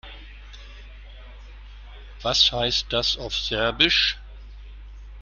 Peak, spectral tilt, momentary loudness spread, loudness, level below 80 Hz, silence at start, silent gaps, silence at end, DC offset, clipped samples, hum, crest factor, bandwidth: -4 dBFS; -2.5 dB/octave; 26 LU; -21 LUFS; -40 dBFS; 0.05 s; none; 0 s; under 0.1%; under 0.1%; 50 Hz at -40 dBFS; 22 dB; 13 kHz